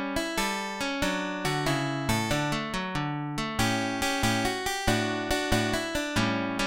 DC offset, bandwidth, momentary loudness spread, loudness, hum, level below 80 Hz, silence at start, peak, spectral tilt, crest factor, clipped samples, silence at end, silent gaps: 0.1%; 17 kHz; 4 LU; -28 LUFS; none; -44 dBFS; 0 s; -10 dBFS; -4 dB/octave; 18 dB; under 0.1%; 0 s; none